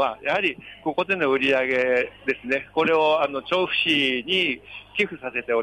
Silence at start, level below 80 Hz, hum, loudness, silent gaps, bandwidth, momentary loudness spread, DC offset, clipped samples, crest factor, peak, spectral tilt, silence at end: 0 s; -60 dBFS; none; -22 LUFS; none; 11 kHz; 8 LU; under 0.1%; under 0.1%; 14 dB; -10 dBFS; -4.5 dB/octave; 0 s